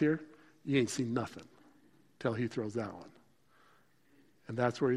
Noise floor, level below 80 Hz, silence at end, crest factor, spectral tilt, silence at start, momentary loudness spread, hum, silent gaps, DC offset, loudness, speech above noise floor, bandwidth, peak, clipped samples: -68 dBFS; -74 dBFS; 0 s; 18 dB; -6 dB/octave; 0 s; 21 LU; none; none; under 0.1%; -36 LUFS; 35 dB; 14 kHz; -18 dBFS; under 0.1%